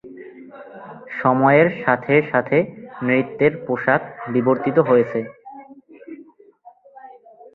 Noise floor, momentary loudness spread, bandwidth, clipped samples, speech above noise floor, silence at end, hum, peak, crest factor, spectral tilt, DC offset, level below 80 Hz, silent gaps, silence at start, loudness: -49 dBFS; 24 LU; 4.3 kHz; under 0.1%; 30 dB; 0.45 s; none; -2 dBFS; 18 dB; -10 dB/octave; under 0.1%; -62 dBFS; none; 0.05 s; -18 LUFS